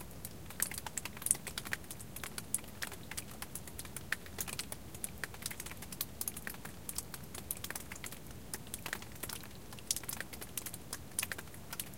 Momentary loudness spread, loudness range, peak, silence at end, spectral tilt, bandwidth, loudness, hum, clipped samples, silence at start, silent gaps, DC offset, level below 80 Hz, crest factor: 8 LU; 4 LU; -8 dBFS; 0 s; -1.5 dB/octave; 17 kHz; -41 LUFS; none; under 0.1%; 0 s; none; 0.2%; -58 dBFS; 36 dB